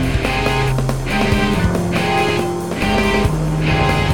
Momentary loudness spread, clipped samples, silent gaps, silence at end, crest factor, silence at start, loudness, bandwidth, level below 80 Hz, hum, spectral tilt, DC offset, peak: 4 LU; under 0.1%; none; 0 s; 14 dB; 0 s; -17 LUFS; 18.5 kHz; -26 dBFS; none; -5.5 dB/octave; 1%; -2 dBFS